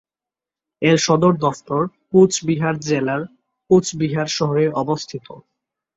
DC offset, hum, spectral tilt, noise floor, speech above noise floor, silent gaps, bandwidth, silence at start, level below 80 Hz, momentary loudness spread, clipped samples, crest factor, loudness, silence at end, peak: under 0.1%; none; -5.5 dB/octave; -89 dBFS; 71 dB; none; 8 kHz; 0.8 s; -56 dBFS; 10 LU; under 0.1%; 18 dB; -18 LUFS; 0.55 s; -2 dBFS